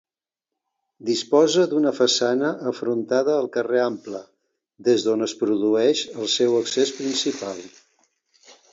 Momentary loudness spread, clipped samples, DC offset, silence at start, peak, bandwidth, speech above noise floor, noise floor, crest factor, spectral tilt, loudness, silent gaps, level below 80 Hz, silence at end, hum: 11 LU; under 0.1%; under 0.1%; 1 s; -6 dBFS; 7.8 kHz; 67 dB; -88 dBFS; 18 dB; -3.5 dB/octave; -21 LUFS; none; -74 dBFS; 1.05 s; none